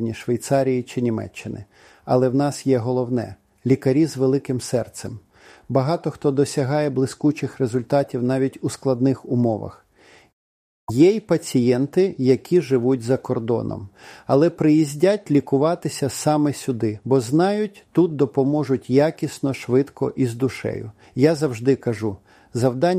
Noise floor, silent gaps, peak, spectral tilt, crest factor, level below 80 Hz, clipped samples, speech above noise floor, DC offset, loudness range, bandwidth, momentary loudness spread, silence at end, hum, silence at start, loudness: -52 dBFS; 10.33-10.87 s; -4 dBFS; -7 dB/octave; 18 dB; -58 dBFS; under 0.1%; 32 dB; under 0.1%; 3 LU; 15.5 kHz; 11 LU; 0 s; none; 0 s; -21 LUFS